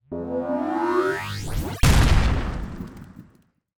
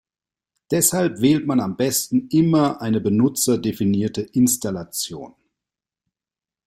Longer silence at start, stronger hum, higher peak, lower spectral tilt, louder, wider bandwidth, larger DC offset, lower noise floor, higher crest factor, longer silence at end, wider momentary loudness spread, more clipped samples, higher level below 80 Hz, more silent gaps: second, 0.1 s vs 0.7 s; neither; about the same, -4 dBFS vs -2 dBFS; about the same, -5.5 dB/octave vs -5 dB/octave; second, -23 LUFS vs -20 LUFS; first, over 20 kHz vs 16.5 kHz; neither; second, -59 dBFS vs under -90 dBFS; about the same, 20 dB vs 20 dB; second, 0.55 s vs 1.35 s; first, 17 LU vs 9 LU; neither; first, -26 dBFS vs -56 dBFS; neither